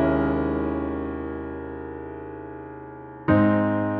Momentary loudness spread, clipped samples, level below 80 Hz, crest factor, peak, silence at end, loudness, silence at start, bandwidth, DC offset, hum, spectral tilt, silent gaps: 18 LU; under 0.1%; -42 dBFS; 18 dB; -6 dBFS; 0 s; -25 LUFS; 0 s; 4.4 kHz; under 0.1%; none; -11.5 dB/octave; none